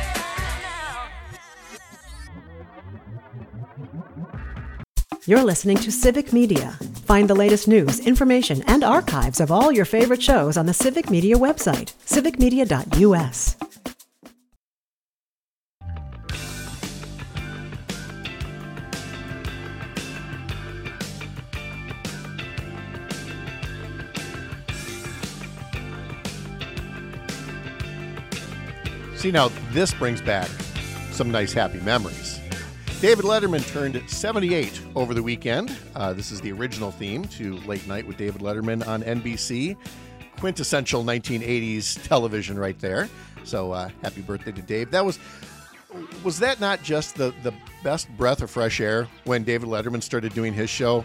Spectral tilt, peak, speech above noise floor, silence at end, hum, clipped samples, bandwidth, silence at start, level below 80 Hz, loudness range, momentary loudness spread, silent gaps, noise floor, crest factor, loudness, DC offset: -5 dB/octave; -2 dBFS; over 69 dB; 0 s; none; under 0.1%; 19 kHz; 0 s; -36 dBFS; 15 LU; 18 LU; 4.88-4.95 s, 14.56-15.81 s; under -90 dBFS; 22 dB; -23 LUFS; under 0.1%